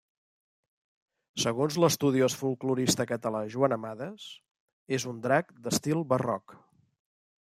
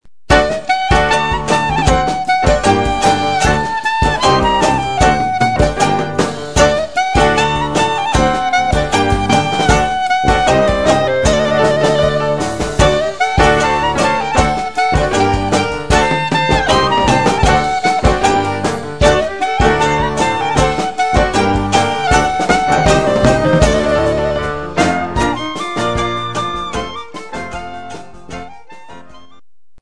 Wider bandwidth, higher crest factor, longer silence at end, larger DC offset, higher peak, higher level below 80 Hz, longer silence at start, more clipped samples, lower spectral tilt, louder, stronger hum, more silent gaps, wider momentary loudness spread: first, 16 kHz vs 11 kHz; first, 20 dB vs 14 dB; first, 0.95 s vs 0 s; second, under 0.1% vs 2%; second, -10 dBFS vs 0 dBFS; second, -70 dBFS vs -26 dBFS; first, 1.35 s vs 0 s; neither; about the same, -4.5 dB/octave vs -4.5 dB/octave; second, -29 LUFS vs -13 LUFS; neither; first, 4.51-4.86 s vs none; first, 13 LU vs 7 LU